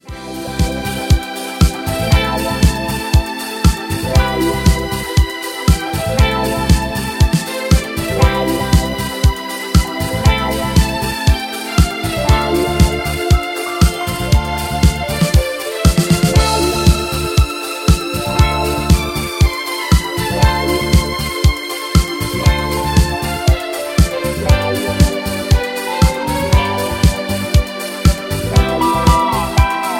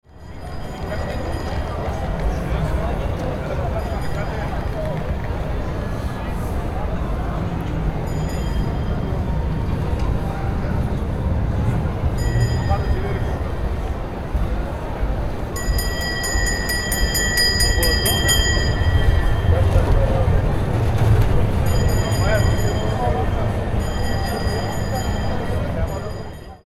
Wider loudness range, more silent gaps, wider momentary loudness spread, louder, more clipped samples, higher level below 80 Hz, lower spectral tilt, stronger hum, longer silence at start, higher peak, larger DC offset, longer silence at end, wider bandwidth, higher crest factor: second, 2 LU vs 7 LU; neither; second, 5 LU vs 9 LU; first, -15 LUFS vs -22 LUFS; neither; first, -18 dBFS vs -24 dBFS; about the same, -5 dB/octave vs -5 dB/octave; neither; about the same, 0.05 s vs 0.15 s; about the same, 0 dBFS vs -2 dBFS; neither; about the same, 0 s vs 0.1 s; about the same, 17 kHz vs 15.5 kHz; about the same, 14 dB vs 16 dB